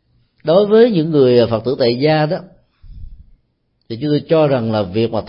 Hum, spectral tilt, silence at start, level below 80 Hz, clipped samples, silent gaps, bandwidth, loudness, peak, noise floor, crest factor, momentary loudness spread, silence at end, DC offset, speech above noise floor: none; -12.5 dB/octave; 0.45 s; -44 dBFS; under 0.1%; none; 5.6 kHz; -14 LUFS; 0 dBFS; -64 dBFS; 14 dB; 11 LU; 0 s; under 0.1%; 51 dB